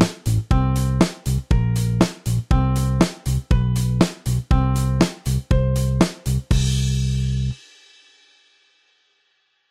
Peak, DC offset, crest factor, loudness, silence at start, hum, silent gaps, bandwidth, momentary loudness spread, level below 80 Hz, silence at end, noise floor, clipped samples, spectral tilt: 0 dBFS; under 0.1%; 20 dB; -21 LUFS; 0 s; none; none; 15.5 kHz; 6 LU; -26 dBFS; 2.15 s; -66 dBFS; under 0.1%; -6.5 dB/octave